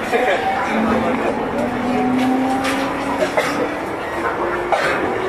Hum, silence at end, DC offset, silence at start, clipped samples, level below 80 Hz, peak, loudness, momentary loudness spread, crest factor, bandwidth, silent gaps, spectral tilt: none; 0 s; under 0.1%; 0 s; under 0.1%; -44 dBFS; -4 dBFS; -19 LUFS; 4 LU; 14 dB; 14 kHz; none; -5 dB/octave